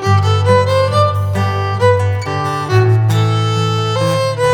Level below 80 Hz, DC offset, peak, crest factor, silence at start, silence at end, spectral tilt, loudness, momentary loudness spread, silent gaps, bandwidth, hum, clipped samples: -48 dBFS; under 0.1%; 0 dBFS; 12 dB; 0 s; 0 s; -6 dB/octave; -14 LUFS; 5 LU; none; 13 kHz; none; under 0.1%